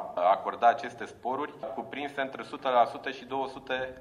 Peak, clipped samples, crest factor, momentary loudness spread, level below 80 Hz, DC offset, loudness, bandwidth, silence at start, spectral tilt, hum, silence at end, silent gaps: -10 dBFS; under 0.1%; 20 dB; 12 LU; -68 dBFS; under 0.1%; -30 LUFS; 10.5 kHz; 0 s; -4.5 dB/octave; none; 0 s; none